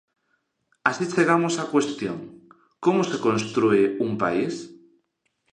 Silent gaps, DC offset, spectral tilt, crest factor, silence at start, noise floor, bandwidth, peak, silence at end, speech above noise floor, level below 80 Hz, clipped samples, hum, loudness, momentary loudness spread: none; under 0.1%; -5.5 dB/octave; 22 dB; 0.85 s; -73 dBFS; 10 kHz; -4 dBFS; 0.8 s; 51 dB; -66 dBFS; under 0.1%; none; -23 LUFS; 12 LU